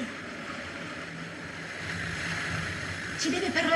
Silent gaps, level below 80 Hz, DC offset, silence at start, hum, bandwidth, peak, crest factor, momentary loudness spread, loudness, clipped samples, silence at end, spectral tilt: none; -56 dBFS; under 0.1%; 0 s; none; 13 kHz; -12 dBFS; 20 dB; 10 LU; -33 LUFS; under 0.1%; 0 s; -3.5 dB/octave